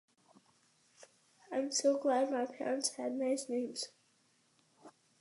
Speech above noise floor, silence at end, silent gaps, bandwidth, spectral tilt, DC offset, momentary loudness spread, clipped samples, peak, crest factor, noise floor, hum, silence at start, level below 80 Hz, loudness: 38 dB; 0.3 s; none; 11.5 kHz; -2 dB/octave; under 0.1%; 10 LU; under 0.1%; -18 dBFS; 20 dB; -73 dBFS; none; 1 s; under -90 dBFS; -35 LUFS